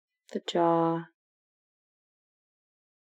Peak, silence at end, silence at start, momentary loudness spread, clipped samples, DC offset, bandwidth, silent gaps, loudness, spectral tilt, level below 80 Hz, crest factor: -14 dBFS; 2.05 s; 0.3 s; 13 LU; under 0.1%; under 0.1%; 8.4 kHz; none; -28 LUFS; -6.5 dB/octave; under -90 dBFS; 20 dB